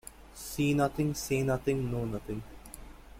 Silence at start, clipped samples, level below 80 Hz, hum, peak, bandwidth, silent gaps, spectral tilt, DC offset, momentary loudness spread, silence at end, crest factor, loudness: 0.05 s; under 0.1%; -50 dBFS; none; -16 dBFS; 16.5 kHz; none; -6 dB/octave; under 0.1%; 20 LU; 0 s; 16 dB; -32 LUFS